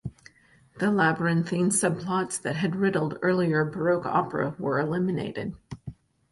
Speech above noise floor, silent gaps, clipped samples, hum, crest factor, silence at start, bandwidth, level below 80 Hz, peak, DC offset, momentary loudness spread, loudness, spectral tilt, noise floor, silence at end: 33 dB; none; under 0.1%; none; 16 dB; 0.05 s; 11.5 kHz; -58 dBFS; -10 dBFS; under 0.1%; 13 LU; -26 LUFS; -5.5 dB/octave; -58 dBFS; 0.4 s